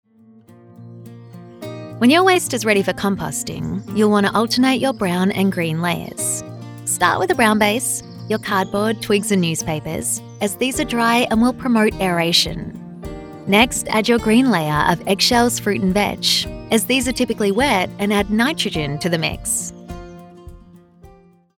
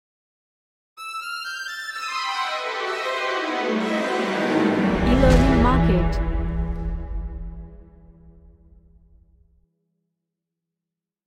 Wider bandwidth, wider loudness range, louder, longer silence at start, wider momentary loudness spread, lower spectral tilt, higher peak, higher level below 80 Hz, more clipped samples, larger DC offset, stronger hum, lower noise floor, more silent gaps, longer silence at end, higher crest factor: first, 18.5 kHz vs 13.5 kHz; second, 3 LU vs 15 LU; first, -18 LUFS vs -22 LUFS; second, 0.8 s vs 0.95 s; second, 11 LU vs 16 LU; second, -4 dB/octave vs -6 dB/octave; about the same, -2 dBFS vs -4 dBFS; second, -42 dBFS vs -30 dBFS; neither; neither; neither; second, -48 dBFS vs -87 dBFS; neither; second, 0.5 s vs 2.95 s; about the same, 18 dB vs 20 dB